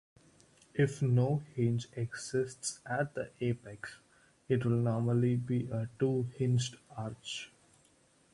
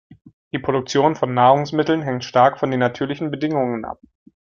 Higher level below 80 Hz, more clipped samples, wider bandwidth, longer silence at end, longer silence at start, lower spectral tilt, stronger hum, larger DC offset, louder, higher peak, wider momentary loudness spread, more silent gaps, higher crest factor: second, -66 dBFS vs -58 dBFS; neither; first, 11.5 kHz vs 7.4 kHz; first, 0.85 s vs 0.5 s; first, 0.75 s vs 0.1 s; about the same, -6.5 dB/octave vs -6 dB/octave; neither; neither; second, -34 LUFS vs -19 LUFS; second, -16 dBFS vs -2 dBFS; about the same, 12 LU vs 12 LU; second, none vs 0.33-0.51 s; about the same, 18 dB vs 18 dB